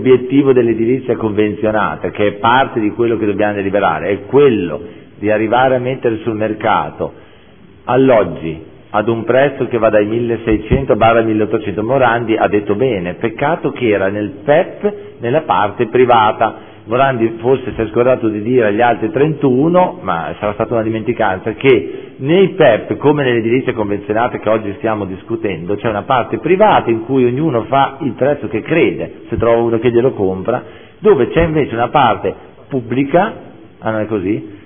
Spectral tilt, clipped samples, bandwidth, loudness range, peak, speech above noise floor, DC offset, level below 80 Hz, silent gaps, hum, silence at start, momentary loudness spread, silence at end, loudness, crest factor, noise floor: -11 dB/octave; under 0.1%; 3.6 kHz; 2 LU; 0 dBFS; 29 dB; 0.3%; -40 dBFS; none; none; 0 s; 9 LU; 0.05 s; -14 LUFS; 14 dB; -42 dBFS